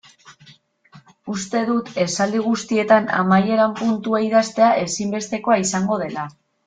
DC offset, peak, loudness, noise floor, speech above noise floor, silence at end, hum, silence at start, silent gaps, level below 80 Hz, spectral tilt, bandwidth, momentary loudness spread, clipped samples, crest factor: under 0.1%; -2 dBFS; -19 LUFS; -51 dBFS; 32 dB; 0.35 s; none; 0.3 s; none; -62 dBFS; -5 dB/octave; 9.4 kHz; 11 LU; under 0.1%; 18 dB